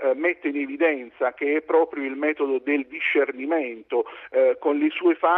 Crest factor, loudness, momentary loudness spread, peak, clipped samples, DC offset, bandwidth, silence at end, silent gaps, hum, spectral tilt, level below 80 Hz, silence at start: 16 dB; -24 LUFS; 6 LU; -6 dBFS; under 0.1%; under 0.1%; 4 kHz; 0 s; none; none; -6 dB/octave; -74 dBFS; 0 s